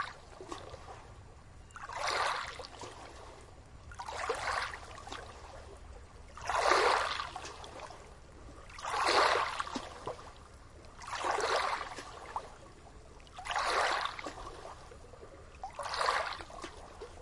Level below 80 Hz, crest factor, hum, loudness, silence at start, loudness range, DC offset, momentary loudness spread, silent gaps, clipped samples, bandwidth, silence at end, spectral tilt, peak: -56 dBFS; 24 dB; none; -34 LUFS; 0 s; 7 LU; under 0.1%; 24 LU; none; under 0.1%; 11.5 kHz; 0 s; -2 dB/octave; -12 dBFS